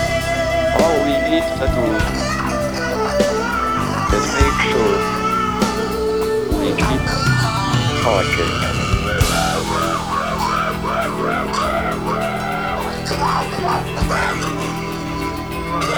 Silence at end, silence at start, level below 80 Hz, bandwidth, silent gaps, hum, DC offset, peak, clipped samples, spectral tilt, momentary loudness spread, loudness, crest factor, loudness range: 0 s; 0 s; -30 dBFS; over 20 kHz; none; none; 0.5%; 0 dBFS; under 0.1%; -5 dB/octave; 5 LU; -18 LUFS; 18 dB; 3 LU